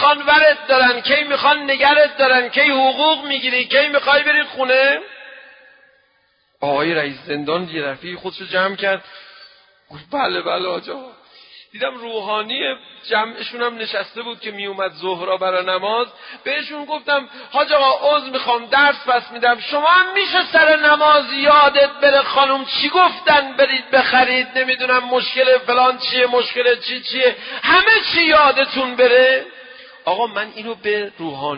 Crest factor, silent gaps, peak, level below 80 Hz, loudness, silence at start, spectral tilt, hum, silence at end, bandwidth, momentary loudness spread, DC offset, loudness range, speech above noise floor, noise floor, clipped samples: 16 dB; none; 0 dBFS; -58 dBFS; -15 LUFS; 0 s; -7.5 dB/octave; none; 0 s; 5.4 kHz; 13 LU; under 0.1%; 10 LU; 45 dB; -61 dBFS; under 0.1%